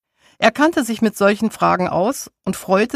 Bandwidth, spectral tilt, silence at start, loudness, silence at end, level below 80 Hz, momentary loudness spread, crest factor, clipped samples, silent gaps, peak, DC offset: 15.5 kHz; -5 dB/octave; 0.4 s; -18 LUFS; 0 s; -54 dBFS; 9 LU; 18 dB; under 0.1%; none; 0 dBFS; under 0.1%